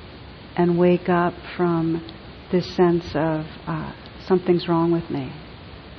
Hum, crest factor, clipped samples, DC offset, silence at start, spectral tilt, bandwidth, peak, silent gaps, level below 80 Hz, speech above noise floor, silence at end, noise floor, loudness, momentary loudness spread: none; 16 dB; under 0.1%; under 0.1%; 0 s; -8.5 dB/octave; 6.2 kHz; -6 dBFS; none; -48 dBFS; 19 dB; 0 s; -40 dBFS; -22 LUFS; 20 LU